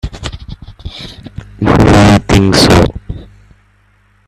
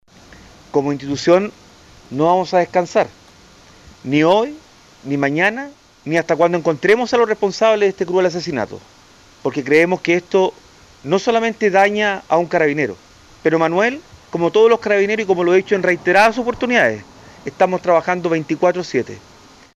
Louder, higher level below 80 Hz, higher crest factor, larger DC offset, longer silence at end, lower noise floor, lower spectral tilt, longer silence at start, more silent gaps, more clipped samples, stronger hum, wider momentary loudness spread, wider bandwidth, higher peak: first, -8 LUFS vs -16 LUFS; first, -24 dBFS vs -54 dBFS; about the same, 12 dB vs 14 dB; neither; first, 1.05 s vs 0.55 s; first, -50 dBFS vs -46 dBFS; about the same, -5.5 dB/octave vs -5.5 dB/octave; second, 0.05 s vs 0.75 s; neither; neither; first, 50 Hz at -30 dBFS vs none; first, 23 LU vs 13 LU; first, 14.5 kHz vs 11.5 kHz; about the same, 0 dBFS vs -2 dBFS